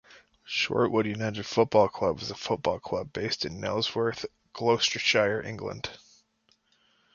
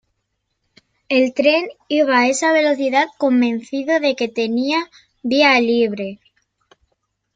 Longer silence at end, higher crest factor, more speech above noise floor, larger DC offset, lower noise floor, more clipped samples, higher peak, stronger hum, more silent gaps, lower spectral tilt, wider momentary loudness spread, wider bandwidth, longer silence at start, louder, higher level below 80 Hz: about the same, 1.2 s vs 1.2 s; first, 22 dB vs 16 dB; second, 42 dB vs 56 dB; neither; second, -69 dBFS vs -73 dBFS; neither; second, -8 dBFS vs -2 dBFS; neither; neither; about the same, -4 dB/octave vs -3.5 dB/octave; first, 12 LU vs 8 LU; second, 7.2 kHz vs 9.4 kHz; second, 0.1 s vs 1.1 s; second, -28 LUFS vs -17 LUFS; first, -58 dBFS vs -66 dBFS